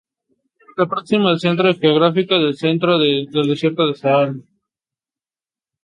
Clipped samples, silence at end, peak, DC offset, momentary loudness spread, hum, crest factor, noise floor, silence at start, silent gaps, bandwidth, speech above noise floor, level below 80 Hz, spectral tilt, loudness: under 0.1%; 1.45 s; -2 dBFS; under 0.1%; 6 LU; none; 16 dB; under -90 dBFS; 0.75 s; none; 10 kHz; over 74 dB; -64 dBFS; -7 dB/octave; -16 LUFS